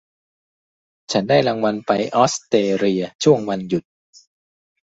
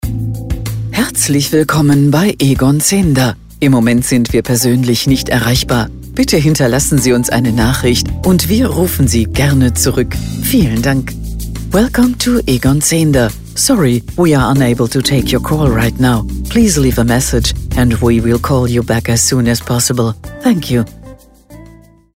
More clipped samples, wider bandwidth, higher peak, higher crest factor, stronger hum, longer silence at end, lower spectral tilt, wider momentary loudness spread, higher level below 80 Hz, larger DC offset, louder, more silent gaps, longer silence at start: neither; second, 8.2 kHz vs 16.5 kHz; about the same, -2 dBFS vs 0 dBFS; first, 18 dB vs 12 dB; neither; first, 1.05 s vs 0.5 s; about the same, -5 dB/octave vs -5 dB/octave; about the same, 7 LU vs 6 LU; second, -60 dBFS vs -26 dBFS; second, under 0.1% vs 0.2%; second, -19 LUFS vs -12 LUFS; first, 3.15-3.19 s vs none; first, 1.1 s vs 0.05 s